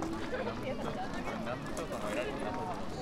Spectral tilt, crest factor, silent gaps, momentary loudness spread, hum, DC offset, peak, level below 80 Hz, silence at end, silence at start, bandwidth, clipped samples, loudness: -5.5 dB/octave; 14 dB; none; 3 LU; none; under 0.1%; -22 dBFS; -52 dBFS; 0 s; 0 s; 16 kHz; under 0.1%; -38 LUFS